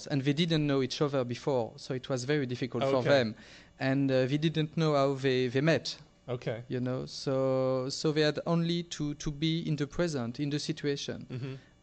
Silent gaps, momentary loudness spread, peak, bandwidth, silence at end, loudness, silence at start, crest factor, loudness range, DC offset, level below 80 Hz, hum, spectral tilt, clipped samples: none; 9 LU; -14 dBFS; 8.8 kHz; 0.25 s; -31 LUFS; 0 s; 16 dB; 3 LU; under 0.1%; -58 dBFS; none; -6 dB/octave; under 0.1%